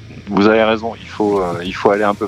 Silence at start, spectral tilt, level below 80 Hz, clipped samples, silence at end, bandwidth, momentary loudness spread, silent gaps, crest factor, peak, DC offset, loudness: 0 s; -6.5 dB/octave; -44 dBFS; under 0.1%; 0 s; 11.5 kHz; 9 LU; none; 16 dB; 0 dBFS; under 0.1%; -16 LUFS